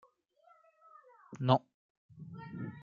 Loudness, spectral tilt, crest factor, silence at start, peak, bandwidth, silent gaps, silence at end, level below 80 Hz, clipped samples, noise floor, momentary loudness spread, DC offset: -34 LUFS; -6 dB/octave; 28 dB; 1.3 s; -10 dBFS; 7 kHz; 1.74-2.09 s; 0 s; -76 dBFS; under 0.1%; -67 dBFS; 23 LU; under 0.1%